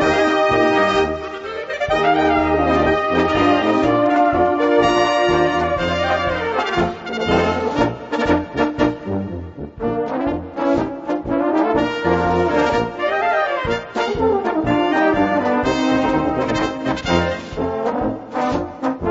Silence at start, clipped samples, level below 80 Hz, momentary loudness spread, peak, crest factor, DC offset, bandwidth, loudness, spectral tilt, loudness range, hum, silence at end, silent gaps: 0 s; under 0.1%; -38 dBFS; 8 LU; -2 dBFS; 16 dB; under 0.1%; 8 kHz; -18 LUFS; -6 dB/octave; 5 LU; none; 0 s; none